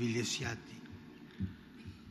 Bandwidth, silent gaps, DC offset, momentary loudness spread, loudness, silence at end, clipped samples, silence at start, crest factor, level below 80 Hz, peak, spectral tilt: 14 kHz; none; under 0.1%; 18 LU; -39 LUFS; 0 s; under 0.1%; 0 s; 18 dB; -64 dBFS; -22 dBFS; -4 dB/octave